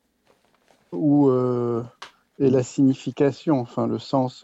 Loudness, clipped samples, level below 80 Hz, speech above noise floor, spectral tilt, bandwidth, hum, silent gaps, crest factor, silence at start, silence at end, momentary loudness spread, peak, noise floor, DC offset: -22 LUFS; under 0.1%; -66 dBFS; 43 dB; -8 dB/octave; 8 kHz; none; none; 16 dB; 0.9 s; 0.1 s; 8 LU; -8 dBFS; -64 dBFS; under 0.1%